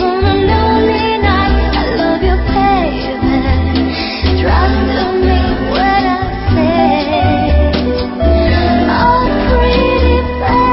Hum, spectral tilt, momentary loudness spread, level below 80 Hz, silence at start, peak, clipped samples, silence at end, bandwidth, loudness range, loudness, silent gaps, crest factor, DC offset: none; -11 dB/octave; 4 LU; -18 dBFS; 0 s; 0 dBFS; under 0.1%; 0 s; 5.8 kHz; 1 LU; -12 LUFS; none; 12 dB; under 0.1%